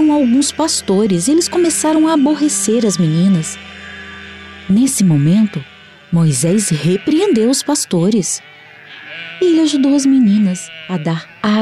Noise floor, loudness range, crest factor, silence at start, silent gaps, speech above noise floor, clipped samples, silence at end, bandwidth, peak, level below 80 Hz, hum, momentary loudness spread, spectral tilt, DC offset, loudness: -37 dBFS; 2 LU; 10 dB; 0 s; none; 24 dB; under 0.1%; 0 s; 14.5 kHz; -4 dBFS; -52 dBFS; none; 17 LU; -5 dB/octave; under 0.1%; -14 LUFS